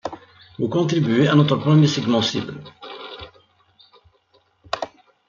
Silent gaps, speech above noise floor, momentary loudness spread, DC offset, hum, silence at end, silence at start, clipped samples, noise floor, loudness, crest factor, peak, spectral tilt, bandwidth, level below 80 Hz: none; 43 dB; 21 LU; under 0.1%; none; 0.4 s; 0.05 s; under 0.1%; -61 dBFS; -19 LUFS; 20 dB; -2 dBFS; -6.5 dB/octave; 7.4 kHz; -60 dBFS